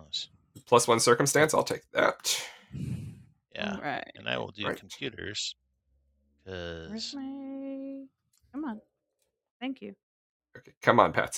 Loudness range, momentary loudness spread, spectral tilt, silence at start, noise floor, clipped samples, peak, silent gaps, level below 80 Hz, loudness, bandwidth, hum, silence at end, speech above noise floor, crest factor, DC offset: 14 LU; 20 LU; -3.5 dB/octave; 0 s; -80 dBFS; under 0.1%; -4 dBFS; 9.51-9.60 s, 10.03-10.40 s, 10.77-10.81 s; -66 dBFS; -29 LUFS; 18 kHz; none; 0 s; 51 dB; 26 dB; under 0.1%